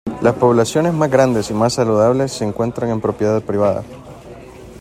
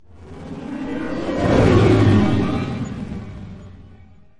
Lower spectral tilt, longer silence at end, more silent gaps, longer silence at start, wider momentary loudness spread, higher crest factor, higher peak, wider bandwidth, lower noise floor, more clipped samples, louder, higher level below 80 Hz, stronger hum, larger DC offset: second, -6 dB/octave vs -8 dB/octave; second, 0 s vs 0.45 s; neither; about the same, 0.05 s vs 0.15 s; about the same, 22 LU vs 22 LU; about the same, 16 dB vs 18 dB; about the same, 0 dBFS vs -2 dBFS; first, 15.5 kHz vs 10.5 kHz; second, -36 dBFS vs -46 dBFS; neither; about the same, -16 LUFS vs -18 LUFS; second, -46 dBFS vs -36 dBFS; neither; neither